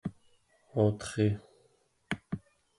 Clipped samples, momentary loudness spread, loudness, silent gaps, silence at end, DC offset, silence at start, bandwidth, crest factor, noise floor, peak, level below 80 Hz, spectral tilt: under 0.1%; 13 LU; -33 LUFS; none; 0.4 s; under 0.1%; 0.05 s; 11.5 kHz; 20 dB; -69 dBFS; -14 dBFS; -58 dBFS; -7 dB/octave